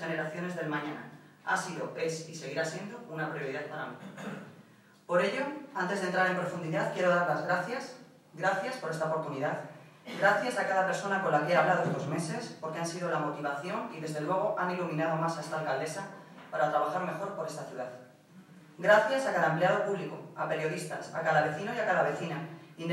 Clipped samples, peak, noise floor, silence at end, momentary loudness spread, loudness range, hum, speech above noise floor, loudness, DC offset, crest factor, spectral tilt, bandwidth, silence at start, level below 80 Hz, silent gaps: under 0.1%; -10 dBFS; -58 dBFS; 0 s; 14 LU; 6 LU; none; 27 dB; -31 LUFS; under 0.1%; 22 dB; -5 dB/octave; 16 kHz; 0 s; under -90 dBFS; none